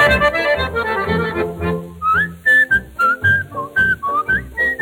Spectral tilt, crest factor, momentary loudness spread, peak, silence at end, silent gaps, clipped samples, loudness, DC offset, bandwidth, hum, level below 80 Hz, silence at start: -5.5 dB/octave; 14 dB; 9 LU; -2 dBFS; 0 s; none; under 0.1%; -16 LUFS; under 0.1%; over 20 kHz; none; -36 dBFS; 0 s